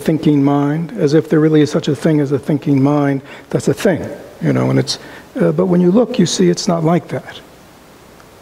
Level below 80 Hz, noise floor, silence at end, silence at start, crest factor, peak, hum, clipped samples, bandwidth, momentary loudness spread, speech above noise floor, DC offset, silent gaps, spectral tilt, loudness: -52 dBFS; -42 dBFS; 1 s; 0 s; 14 dB; -2 dBFS; none; under 0.1%; 15.5 kHz; 10 LU; 27 dB; under 0.1%; none; -6.5 dB/octave; -15 LUFS